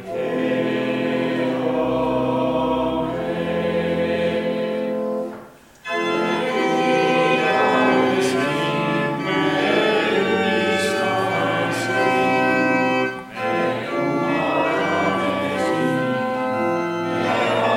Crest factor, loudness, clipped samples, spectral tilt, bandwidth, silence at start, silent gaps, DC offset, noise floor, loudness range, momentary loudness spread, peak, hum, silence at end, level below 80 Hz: 14 dB; -20 LUFS; under 0.1%; -5.5 dB/octave; 16 kHz; 0 s; none; under 0.1%; -42 dBFS; 4 LU; 6 LU; -6 dBFS; none; 0 s; -54 dBFS